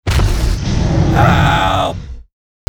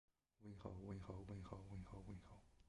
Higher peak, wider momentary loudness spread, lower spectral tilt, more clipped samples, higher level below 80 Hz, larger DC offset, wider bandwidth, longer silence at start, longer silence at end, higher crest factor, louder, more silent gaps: first, 0 dBFS vs -38 dBFS; about the same, 10 LU vs 8 LU; second, -6 dB/octave vs -8 dB/octave; neither; first, -20 dBFS vs -64 dBFS; neither; first, 18.5 kHz vs 11 kHz; second, 0.05 s vs 0.4 s; first, 0.45 s vs 0 s; about the same, 14 dB vs 18 dB; first, -14 LUFS vs -56 LUFS; neither